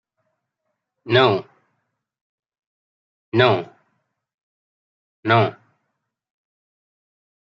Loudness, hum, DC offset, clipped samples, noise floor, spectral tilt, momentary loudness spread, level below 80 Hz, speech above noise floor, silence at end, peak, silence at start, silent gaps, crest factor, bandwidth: -19 LUFS; none; under 0.1%; under 0.1%; -78 dBFS; -7.5 dB/octave; 11 LU; -68 dBFS; 61 dB; 2.05 s; -2 dBFS; 1.05 s; 2.21-2.43 s, 2.59-3.32 s, 4.34-5.23 s; 24 dB; 7.2 kHz